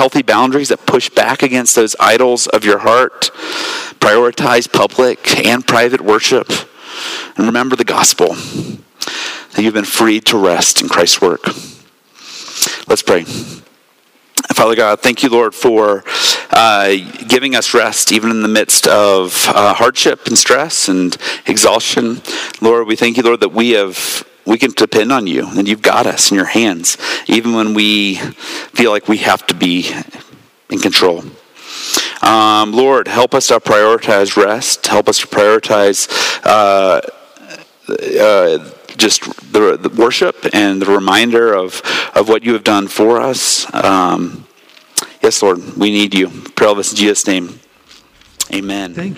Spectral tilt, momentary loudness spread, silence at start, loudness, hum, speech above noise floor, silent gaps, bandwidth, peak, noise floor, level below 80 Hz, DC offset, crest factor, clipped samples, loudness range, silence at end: -2.5 dB/octave; 10 LU; 0 s; -11 LUFS; none; 39 dB; none; 16.5 kHz; 0 dBFS; -51 dBFS; -56 dBFS; under 0.1%; 12 dB; under 0.1%; 4 LU; 0 s